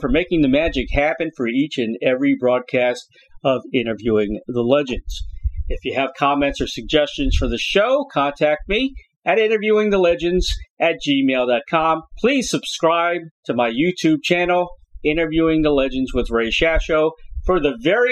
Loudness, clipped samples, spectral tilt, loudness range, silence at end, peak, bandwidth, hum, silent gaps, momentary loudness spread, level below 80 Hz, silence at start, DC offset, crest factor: -19 LUFS; under 0.1%; -5 dB/octave; 3 LU; 0 s; -2 dBFS; 13 kHz; none; 9.16-9.20 s, 10.70-10.77 s, 13.31-13.43 s; 8 LU; -32 dBFS; 0 s; under 0.1%; 18 dB